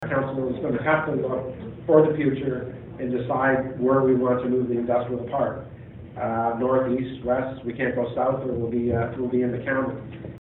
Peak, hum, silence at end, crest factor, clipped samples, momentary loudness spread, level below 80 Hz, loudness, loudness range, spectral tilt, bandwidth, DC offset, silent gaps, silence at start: -2 dBFS; none; 0.05 s; 22 dB; under 0.1%; 12 LU; -52 dBFS; -24 LUFS; 3 LU; -11 dB/octave; 4 kHz; under 0.1%; none; 0 s